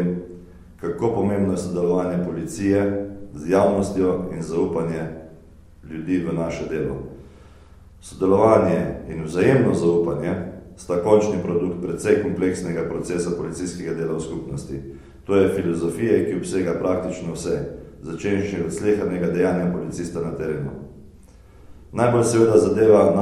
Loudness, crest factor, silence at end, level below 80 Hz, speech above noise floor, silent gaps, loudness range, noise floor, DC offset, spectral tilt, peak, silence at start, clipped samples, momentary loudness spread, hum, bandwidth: -22 LUFS; 20 dB; 0 s; -46 dBFS; 26 dB; none; 5 LU; -47 dBFS; under 0.1%; -7 dB/octave; 0 dBFS; 0 s; under 0.1%; 16 LU; none; 12.5 kHz